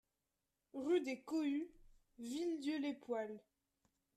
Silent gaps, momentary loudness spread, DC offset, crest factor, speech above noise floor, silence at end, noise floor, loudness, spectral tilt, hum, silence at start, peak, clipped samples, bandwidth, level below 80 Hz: none; 15 LU; under 0.1%; 18 dB; 49 dB; 0.75 s; -90 dBFS; -42 LUFS; -4 dB/octave; none; 0.75 s; -26 dBFS; under 0.1%; 13.5 kHz; -76 dBFS